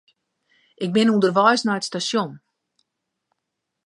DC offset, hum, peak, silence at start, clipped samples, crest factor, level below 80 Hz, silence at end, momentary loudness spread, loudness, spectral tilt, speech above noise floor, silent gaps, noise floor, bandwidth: under 0.1%; none; -2 dBFS; 0.8 s; under 0.1%; 20 dB; -72 dBFS; 1.5 s; 10 LU; -20 LUFS; -4.5 dB/octave; 61 dB; none; -80 dBFS; 11.5 kHz